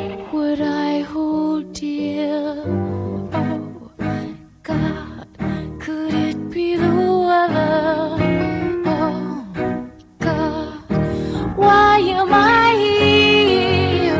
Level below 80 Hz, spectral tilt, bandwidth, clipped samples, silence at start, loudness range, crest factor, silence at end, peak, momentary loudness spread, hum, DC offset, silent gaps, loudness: -38 dBFS; -6.5 dB/octave; 8 kHz; under 0.1%; 0 s; 10 LU; 16 dB; 0 s; -2 dBFS; 15 LU; none; under 0.1%; none; -18 LUFS